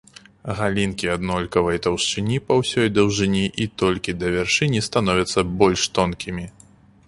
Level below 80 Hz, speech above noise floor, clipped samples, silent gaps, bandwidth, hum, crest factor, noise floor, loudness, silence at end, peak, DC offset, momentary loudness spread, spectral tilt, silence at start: -42 dBFS; 30 dB; under 0.1%; none; 11.5 kHz; none; 20 dB; -51 dBFS; -21 LUFS; 0.55 s; -2 dBFS; under 0.1%; 6 LU; -4.5 dB/octave; 0.45 s